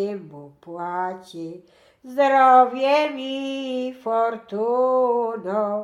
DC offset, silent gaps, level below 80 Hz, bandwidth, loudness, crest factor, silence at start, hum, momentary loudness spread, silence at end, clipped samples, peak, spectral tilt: under 0.1%; none; -74 dBFS; 11.5 kHz; -21 LUFS; 18 dB; 0 s; none; 20 LU; 0 s; under 0.1%; -2 dBFS; -5.5 dB/octave